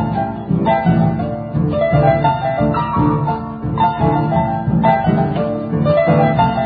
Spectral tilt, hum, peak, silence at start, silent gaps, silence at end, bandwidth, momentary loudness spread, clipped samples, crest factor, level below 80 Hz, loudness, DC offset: -13.5 dB/octave; none; 0 dBFS; 0 s; none; 0 s; 4.9 kHz; 7 LU; under 0.1%; 14 dB; -34 dBFS; -16 LUFS; under 0.1%